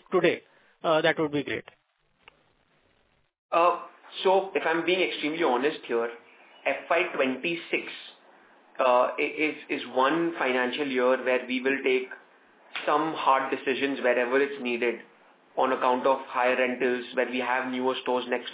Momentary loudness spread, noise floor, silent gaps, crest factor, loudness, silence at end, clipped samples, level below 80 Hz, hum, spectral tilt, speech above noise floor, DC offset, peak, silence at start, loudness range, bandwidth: 9 LU; -68 dBFS; 3.38-3.49 s; 20 dB; -26 LUFS; 0 s; under 0.1%; -78 dBFS; none; -8 dB/octave; 42 dB; under 0.1%; -8 dBFS; 0.1 s; 3 LU; 4 kHz